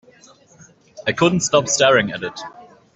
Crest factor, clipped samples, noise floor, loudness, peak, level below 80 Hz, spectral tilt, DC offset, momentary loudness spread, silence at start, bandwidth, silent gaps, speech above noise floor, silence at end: 18 dB; under 0.1%; -50 dBFS; -17 LUFS; -2 dBFS; -56 dBFS; -3.5 dB/octave; under 0.1%; 17 LU; 0.95 s; 8.4 kHz; none; 32 dB; 0.3 s